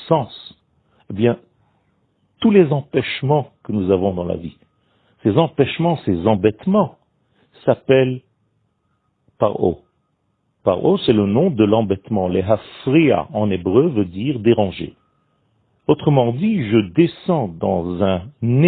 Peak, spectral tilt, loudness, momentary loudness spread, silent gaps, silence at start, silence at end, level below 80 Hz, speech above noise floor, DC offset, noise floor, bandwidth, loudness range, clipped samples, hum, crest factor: 0 dBFS; -12 dB/octave; -18 LUFS; 9 LU; none; 0 s; 0 s; -52 dBFS; 51 dB; under 0.1%; -67 dBFS; 4.6 kHz; 4 LU; under 0.1%; none; 18 dB